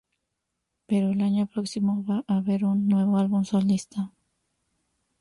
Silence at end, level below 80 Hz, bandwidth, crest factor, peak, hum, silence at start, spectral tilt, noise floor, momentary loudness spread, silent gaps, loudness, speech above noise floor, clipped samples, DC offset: 1.1 s; -66 dBFS; 11.5 kHz; 12 dB; -14 dBFS; none; 0.9 s; -7.5 dB/octave; -81 dBFS; 6 LU; none; -25 LUFS; 57 dB; under 0.1%; under 0.1%